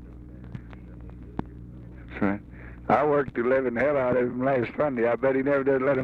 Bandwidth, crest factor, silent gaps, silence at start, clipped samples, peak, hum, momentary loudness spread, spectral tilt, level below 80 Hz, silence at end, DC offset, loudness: 6 kHz; 16 dB; none; 0 s; under 0.1%; -10 dBFS; none; 21 LU; -9.5 dB/octave; -48 dBFS; 0 s; under 0.1%; -25 LUFS